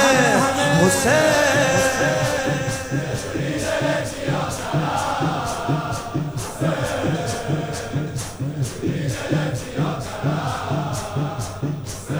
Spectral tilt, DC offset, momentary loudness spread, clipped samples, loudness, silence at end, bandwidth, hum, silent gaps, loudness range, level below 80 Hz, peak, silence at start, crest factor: -4.5 dB/octave; under 0.1%; 10 LU; under 0.1%; -21 LUFS; 0 s; over 20 kHz; none; none; 6 LU; -44 dBFS; -2 dBFS; 0 s; 20 dB